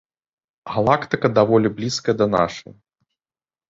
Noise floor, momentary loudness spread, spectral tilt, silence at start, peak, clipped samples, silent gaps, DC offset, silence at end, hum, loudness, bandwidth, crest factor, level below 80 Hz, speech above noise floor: under -90 dBFS; 8 LU; -6 dB/octave; 0.65 s; -2 dBFS; under 0.1%; none; under 0.1%; 1.1 s; none; -19 LUFS; 8 kHz; 20 dB; -54 dBFS; over 71 dB